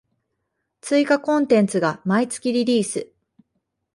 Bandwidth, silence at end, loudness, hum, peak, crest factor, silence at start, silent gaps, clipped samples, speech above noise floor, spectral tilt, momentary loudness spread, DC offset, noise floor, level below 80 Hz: 11.5 kHz; 0.9 s; -20 LUFS; none; -4 dBFS; 18 dB; 0.85 s; none; under 0.1%; 57 dB; -5 dB/octave; 8 LU; under 0.1%; -76 dBFS; -68 dBFS